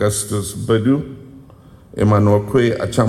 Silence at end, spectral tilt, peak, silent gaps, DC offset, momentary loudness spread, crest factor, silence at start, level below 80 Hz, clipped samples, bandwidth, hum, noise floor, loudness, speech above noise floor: 0 s; -6 dB/octave; -4 dBFS; none; under 0.1%; 16 LU; 14 dB; 0 s; -44 dBFS; under 0.1%; 13.5 kHz; none; -43 dBFS; -17 LUFS; 27 dB